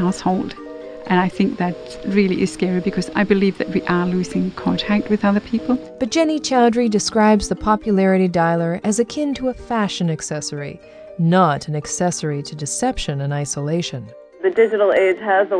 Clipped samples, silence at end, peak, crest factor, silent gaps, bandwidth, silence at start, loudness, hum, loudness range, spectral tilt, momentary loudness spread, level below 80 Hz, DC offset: under 0.1%; 0 s; 0 dBFS; 18 dB; none; 10 kHz; 0 s; -19 LUFS; none; 4 LU; -5.5 dB/octave; 10 LU; -44 dBFS; under 0.1%